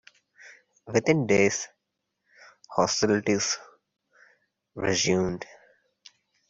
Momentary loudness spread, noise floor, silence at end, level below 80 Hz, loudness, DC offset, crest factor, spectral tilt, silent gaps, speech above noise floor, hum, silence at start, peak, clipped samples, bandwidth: 14 LU; -81 dBFS; 1.05 s; -60 dBFS; -25 LUFS; under 0.1%; 22 dB; -4 dB/octave; none; 57 dB; none; 0.45 s; -6 dBFS; under 0.1%; 8 kHz